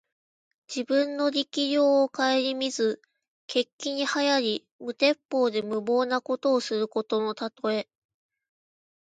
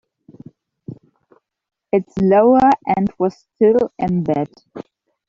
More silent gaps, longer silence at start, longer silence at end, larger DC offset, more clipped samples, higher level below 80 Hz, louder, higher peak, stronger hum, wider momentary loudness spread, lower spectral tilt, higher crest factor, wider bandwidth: first, 3.28-3.48 s, 3.73-3.79 s, 4.72-4.79 s, 5.25-5.29 s vs none; second, 0.7 s vs 0.9 s; first, 1.25 s vs 0.45 s; neither; neither; second, -80 dBFS vs -52 dBFS; second, -26 LUFS vs -16 LUFS; second, -8 dBFS vs -2 dBFS; neither; second, 8 LU vs 25 LU; second, -3 dB/octave vs -9 dB/octave; about the same, 18 dB vs 16 dB; first, 9.2 kHz vs 7.4 kHz